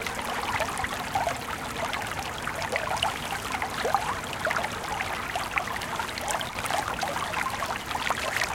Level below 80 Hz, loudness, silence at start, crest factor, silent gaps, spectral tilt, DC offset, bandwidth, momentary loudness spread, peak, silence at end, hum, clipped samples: -48 dBFS; -29 LUFS; 0 s; 22 dB; none; -2.5 dB/octave; under 0.1%; 17 kHz; 4 LU; -6 dBFS; 0 s; none; under 0.1%